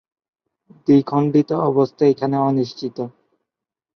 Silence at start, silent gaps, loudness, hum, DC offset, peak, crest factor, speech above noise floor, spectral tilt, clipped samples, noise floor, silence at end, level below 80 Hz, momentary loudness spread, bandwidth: 0.9 s; none; -18 LUFS; none; under 0.1%; -4 dBFS; 16 dB; 69 dB; -9 dB/octave; under 0.1%; -86 dBFS; 0.85 s; -64 dBFS; 12 LU; 6.4 kHz